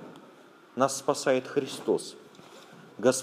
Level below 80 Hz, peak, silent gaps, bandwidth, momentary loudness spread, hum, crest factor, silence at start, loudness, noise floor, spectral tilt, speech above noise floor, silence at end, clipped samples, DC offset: -82 dBFS; -8 dBFS; none; 15.5 kHz; 23 LU; none; 22 dB; 0 s; -28 LUFS; -54 dBFS; -3.5 dB/octave; 26 dB; 0 s; under 0.1%; under 0.1%